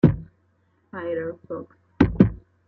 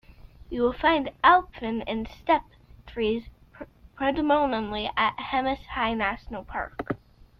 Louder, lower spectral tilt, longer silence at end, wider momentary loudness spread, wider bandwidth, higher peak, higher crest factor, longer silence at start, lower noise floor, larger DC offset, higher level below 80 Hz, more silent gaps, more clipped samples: first, -23 LUFS vs -26 LUFS; first, -10.5 dB/octave vs -7 dB/octave; second, 0.3 s vs 0.45 s; about the same, 17 LU vs 15 LU; about the same, 6.2 kHz vs 6.4 kHz; first, -2 dBFS vs -6 dBFS; about the same, 22 dB vs 22 dB; second, 0.05 s vs 0.2 s; first, -65 dBFS vs -46 dBFS; neither; first, -40 dBFS vs -48 dBFS; neither; neither